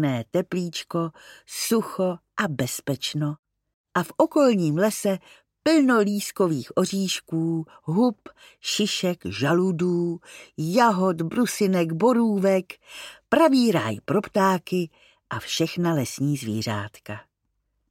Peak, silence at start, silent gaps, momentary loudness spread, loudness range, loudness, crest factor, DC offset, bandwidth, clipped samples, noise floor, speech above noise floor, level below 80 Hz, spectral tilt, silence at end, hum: -6 dBFS; 0 s; 3.39-3.43 s, 3.74-3.84 s; 13 LU; 5 LU; -24 LUFS; 18 dB; under 0.1%; 16.5 kHz; under 0.1%; -75 dBFS; 52 dB; -66 dBFS; -5.5 dB/octave; 0.7 s; none